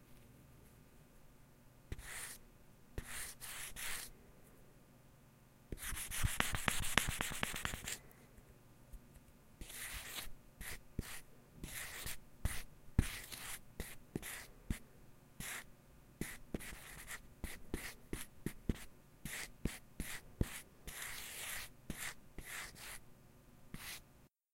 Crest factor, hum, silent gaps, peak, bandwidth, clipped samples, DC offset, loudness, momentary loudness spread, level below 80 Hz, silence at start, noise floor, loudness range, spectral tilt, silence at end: 40 dB; none; none; -6 dBFS; 16 kHz; under 0.1%; under 0.1%; -45 LUFS; 25 LU; -52 dBFS; 0 s; -67 dBFS; 10 LU; -3 dB/octave; 0.25 s